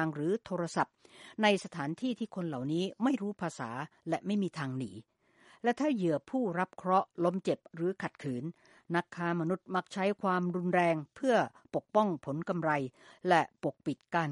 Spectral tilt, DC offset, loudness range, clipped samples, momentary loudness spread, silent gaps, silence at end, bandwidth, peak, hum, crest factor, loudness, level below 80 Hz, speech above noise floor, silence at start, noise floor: -6.5 dB/octave; under 0.1%; 4 LU; under 0.1%; 10 LU; none; 0 s; 11.5 kHz; -12 dBFS; none; 20 dB; -33 LUFS; -76 dBFS; 31 dB; 0 s; -63 dBFS